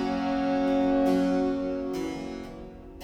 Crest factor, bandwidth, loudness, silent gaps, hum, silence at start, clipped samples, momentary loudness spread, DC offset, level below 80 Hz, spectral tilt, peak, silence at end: 14 dB; 9.6 kHz; -27 LUFS; none; none; 0 s; under 0.1%; 16 LU; under 0.1%; -48 dBFS; -6.5 dB/octave; -14 dBFS; 0 s